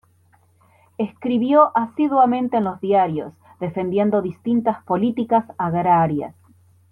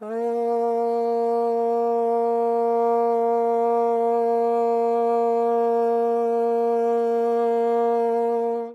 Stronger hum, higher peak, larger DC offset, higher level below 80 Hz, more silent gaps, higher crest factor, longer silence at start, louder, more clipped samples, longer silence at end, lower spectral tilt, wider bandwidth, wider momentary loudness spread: neither; first, -4 dBFS vs -12 dBFS; neither; first, -62 dBFS vs under -90 dBFS; neither; first, 16 dB vs 10 dB; first, 1 s vs 0 s; about the same, -20 LUFS vs -22 LUFS; neither; first, 0.6 s vs 0 s; first, -9.5 dB/octave vs -6.5 dB/octave; second, 4.3 kHz vs 7 kHz; first, 12 LU vs 2 LU